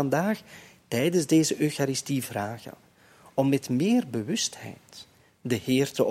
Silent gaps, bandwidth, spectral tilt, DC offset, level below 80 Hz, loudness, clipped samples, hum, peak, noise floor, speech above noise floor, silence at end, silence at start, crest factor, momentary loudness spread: none; 16.5 kHz; -5 dB/octave; under 0.1%; -68 dBFS; -26 LUFS; under 0.1%; none; -10 dBFS; -56 dBFS; 29 dB; 0 s; 0 s; 18 dB; 19 LU